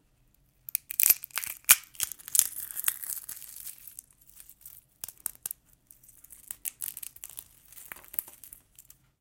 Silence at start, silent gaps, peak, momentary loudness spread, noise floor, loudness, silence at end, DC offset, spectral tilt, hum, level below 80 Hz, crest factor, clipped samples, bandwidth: 0.75 s; none; 0 dBFS; 27 LU; -66 dBFS; -27 LUFS; 0.4 s; under 0.1%; 2.5 dB/octave; none; -68 dBFS; 34 dB; under 0.1%; 17 kHz